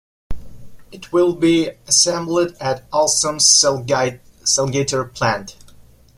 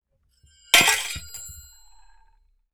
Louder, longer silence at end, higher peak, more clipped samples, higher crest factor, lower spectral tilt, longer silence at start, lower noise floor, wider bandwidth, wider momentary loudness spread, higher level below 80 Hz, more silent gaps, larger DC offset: about the same, -16 LUFS vs -18 LUFS; second, 0.65 s vs 1.15 s; about the same, 0 dBFS vs -2 dBFS; neither; second, 18 dB vs 26 dB; first, -2.5 dB/octave vs 0.5 dB/octave; second, 0.3 s vs 0.75 s; second, -46 dBFS vs -62 dBFS; second, 15.5 kHz vs over 20 kHz; second, 12 LU vs 22 LU; first, -42 dBFS vs -52 dBFS; neither; neither